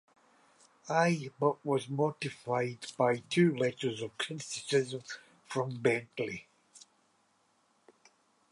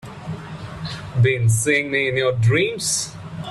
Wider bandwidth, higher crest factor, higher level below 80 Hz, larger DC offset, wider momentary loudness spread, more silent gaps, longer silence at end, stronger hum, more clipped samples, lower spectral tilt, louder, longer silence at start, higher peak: about the same, 11.5 kHz vs 12.5 kHz; first, 20 dB vs 14 dB; second, -78 dBFS vs -48 dBFS; neither; second, 11 LU vs 15 LU; neither; first, 1.75 s vs 0 s; neither; neither; about the same, -5.5 dB/octave vs -4.5 dB/octave; second, -32 LUFS vs -19 LUFS; first, 0.85 s vs 0.05 s; second, -14 dBFS vs -6 dBFS